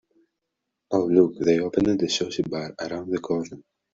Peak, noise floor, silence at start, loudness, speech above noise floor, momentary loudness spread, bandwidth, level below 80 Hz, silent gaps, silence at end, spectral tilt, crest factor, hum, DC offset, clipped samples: -4 dBFS; -82 dBFS; 0.9 s; -24 LUFS; 58 dB; 11 LU; 7.8 kHz; -58 dBFS; none; 0.35 s; -5.5 dB/octave; 20 dB; none; under 0.1%; under 0.1%